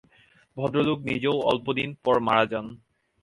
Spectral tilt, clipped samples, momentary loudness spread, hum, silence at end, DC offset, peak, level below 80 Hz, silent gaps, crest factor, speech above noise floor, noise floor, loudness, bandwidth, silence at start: -7 dB/octave; under 0.1%; 11 LU; none; 0.45 s; under 0.1%; -6 dBFS; -58 dBFS; none; 20 dB; 35 dB; -60 dBFS; -25 LUFS; 11.5 kHz; 0.55 s